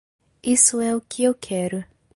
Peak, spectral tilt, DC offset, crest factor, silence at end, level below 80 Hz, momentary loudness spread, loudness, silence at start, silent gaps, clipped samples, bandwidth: -2 dBFS; -3.5 dB/octave; under 0.1%; 20 dB; 0.3 s; -60 dBFS; 14 LU; -20 LUFS; 0.45 s; none; under 0.1%; 11.5 kHz